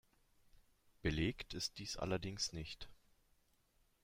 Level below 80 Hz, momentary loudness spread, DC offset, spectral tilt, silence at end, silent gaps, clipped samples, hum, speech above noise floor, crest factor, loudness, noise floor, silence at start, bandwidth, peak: -58 dBFS; 12 LU; under 0.1%; -4 dB/octave; 1.1 s; none; under 0.1%; none; 34 dB; 20 dB; -42 LUFS; -76 dBFS; 0.55 s; 16 kHz; -26 dBFS